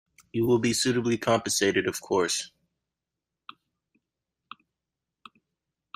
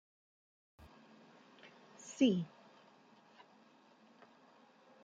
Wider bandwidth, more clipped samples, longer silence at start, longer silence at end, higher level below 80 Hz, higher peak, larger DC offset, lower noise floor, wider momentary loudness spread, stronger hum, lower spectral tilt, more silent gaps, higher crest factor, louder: first, 15.5 kHz vs 8 kHz; neither; second, 0.35 s vs 2.05 s; first, 3.5 s vs 2.55 s; first, -64 dBFS vs -80 dBFS; first, -10 dBFS vs -18 dBFS; neither; first, -87 dBFS vs -66 dBFS; second, 7 LU vs 30 LU; neither; second, -3.5 dB/octave vs -5.5 dB/octave; neither; second, 20 dB vs 26 dB; first, -26 LUFS vs -36 LUFS